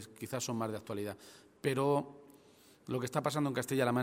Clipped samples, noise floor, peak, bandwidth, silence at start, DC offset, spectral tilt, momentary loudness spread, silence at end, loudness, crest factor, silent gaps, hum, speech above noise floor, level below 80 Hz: under 0.1%; -62 dBFS; -16 dBFS; 16 kHz; 0 s; under 0.1%; -5.5 dB/octave; 17 LU; 0 s; -36 LUFS; 20 dB; none; none; 27 dB; -74 dBFS